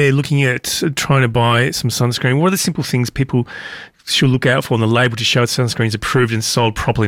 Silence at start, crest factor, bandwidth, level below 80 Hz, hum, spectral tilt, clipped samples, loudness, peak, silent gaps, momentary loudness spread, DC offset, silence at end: 0 s; 10 dB; 16.5 kHz; -40 dBFS; none; -4.5 dB/octave; under 0.1%; -15 LUFS; -4 dBFS; none; 5 LU; under 0.1%; 0 s